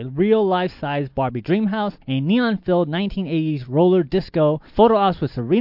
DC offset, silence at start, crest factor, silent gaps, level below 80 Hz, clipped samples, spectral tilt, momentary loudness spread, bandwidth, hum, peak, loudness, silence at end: under 0.1%; 0 s; 16 dB; none; -44 dBFS; under 0.1%; -10 dB/octave; 8 LU; 5.8 kHz; none; -2 dBFS; -20 LUFS; 0 s